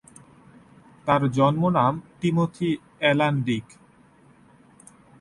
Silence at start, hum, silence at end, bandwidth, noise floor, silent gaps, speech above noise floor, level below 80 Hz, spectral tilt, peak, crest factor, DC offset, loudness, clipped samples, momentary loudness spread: 1.05 s; none; 1.6 s; 11.5 kHz; -55 dBFS; none; 33 dB; -58 dBFS; -7 dB/octave; -6 dBFS; 20 dB; under 0.1%; -23 LUFS; under 0.1%; 8 LU